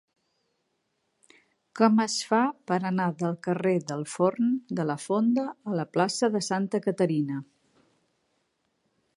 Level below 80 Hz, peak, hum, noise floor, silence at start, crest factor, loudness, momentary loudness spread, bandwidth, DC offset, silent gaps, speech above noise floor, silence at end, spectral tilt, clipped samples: -78 dBFS; -6 dBFS; none; -76 dBFS; 1.75 s; 22 dB; -27 LUFS; 6 LU; 11.5 kHz; under 0.1%; none; 50 dB; 1.75 s; -5.5 dB/octave; under 0.1%